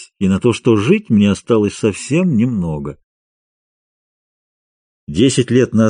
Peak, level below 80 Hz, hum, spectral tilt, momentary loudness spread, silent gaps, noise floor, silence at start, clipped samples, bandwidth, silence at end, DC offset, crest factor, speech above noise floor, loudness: 0 dBFS; -46 dBFS; none; -6.5 dB/octave; 9 LU; 3.04-5.07 s; under -90 dBFS; 0 s; under 0.1%; 10 kHz; 0 s; under 0.1%; 16 dB; over 76 dB; -15 LUFS